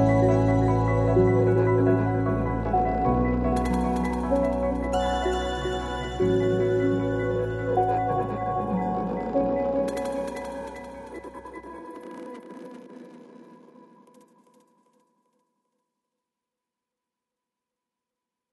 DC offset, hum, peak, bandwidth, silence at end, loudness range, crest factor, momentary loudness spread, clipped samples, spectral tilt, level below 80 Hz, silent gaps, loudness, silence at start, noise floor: under 0.1%; none; -10 dBFS; 12 kHz; 5 s; 19 LU; 16 dB; 19 LU; under 0.1%; -8 dB/octave; -38 dBFS; none; -25 LUFS; 0 s; -87 dBFS